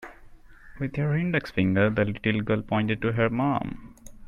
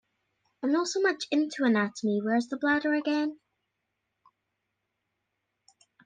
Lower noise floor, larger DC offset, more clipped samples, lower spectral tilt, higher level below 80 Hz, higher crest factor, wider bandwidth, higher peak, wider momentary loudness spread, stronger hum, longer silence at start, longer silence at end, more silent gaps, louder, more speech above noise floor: second, -48 dBFS vs -82 dBFS; neither; neither; first, -8 dB/octave vs -4.5 dB/octave; first, -48 dBFS vs -80 dBFS; about the same, 18 dB vs 18 dB; first, 11.5 kHz vs 9.4 kHz; first, -10 dBFS vs -14 dBFS; first, 11 LU vs 4 LU; neither; second, 0 s vs 0.6 s; second, 0 s vs 2.7 s; neither; about the same, -26 LUFS vs -28 LUFS; second, 23 dB vs 55 dB